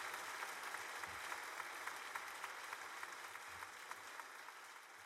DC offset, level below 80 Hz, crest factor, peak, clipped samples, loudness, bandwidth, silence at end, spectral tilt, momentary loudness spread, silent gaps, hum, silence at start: under 0.1%; -86 dBFS; 20 dB; -30 dBFS; under 0.1%; -49 LUFS; 16 kHz; 0 s; 0 dB/octave; 6 LU; none; none; 0 s